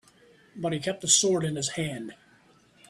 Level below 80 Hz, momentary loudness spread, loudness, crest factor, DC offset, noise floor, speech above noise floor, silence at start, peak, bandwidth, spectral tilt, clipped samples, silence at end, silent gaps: -66 dBFS; 15 LU; -25 LUFS; 22 dB; under 0.1%; -60 dBFS; 33 dB; 0.55 s; -6 dBFS; 13.5 kHz; -3 dB/octave; under 0.1%; 0.75 s; none